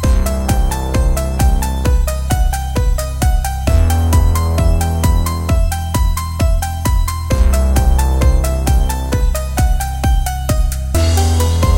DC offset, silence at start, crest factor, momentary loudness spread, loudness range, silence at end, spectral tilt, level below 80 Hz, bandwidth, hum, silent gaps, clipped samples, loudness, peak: under 0.1%; 0 s; 12 dB; 4 LU; 1 LU; 0 s; -5.5 dB/octave; -14 dBFS; 17 kHz; none; none; under 0.1%; -16 LUFS; 0 dBFS